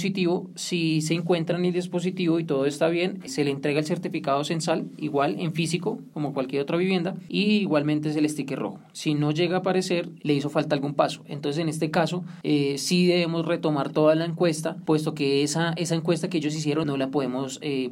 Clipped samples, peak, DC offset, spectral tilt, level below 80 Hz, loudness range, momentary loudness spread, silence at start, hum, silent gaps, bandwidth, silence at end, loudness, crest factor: under 0.1%; -8 dBFS; under 0.1%; -5.5 dB/octave; -70 dBFS; 3 LU; 6 LU; 0 s; none; none; 16 kHz; 0 s; -25 LUFS; 18 dB